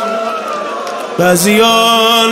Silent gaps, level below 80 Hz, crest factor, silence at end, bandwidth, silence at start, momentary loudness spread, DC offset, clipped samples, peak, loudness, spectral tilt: none; -54 dBFS; 12 dB; 0 s; 16 kHz; 0 s; 12 LU; under 0.1%; under 0.1%; 0 dBFS; -11 LUFS; -3 dB/octave